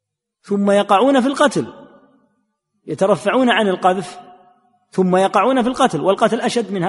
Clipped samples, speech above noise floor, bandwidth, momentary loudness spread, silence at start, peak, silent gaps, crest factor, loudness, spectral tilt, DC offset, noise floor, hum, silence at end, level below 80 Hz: under 0.1%; 53 dB; 11.5 kHz; 11 LU; 0.5 s; 0 dBFS; none; 16 dB; -16 LUFS; -5.5 dB/octave; under 0.1%; -69 dBFS; none; 0 s; -60 dBFS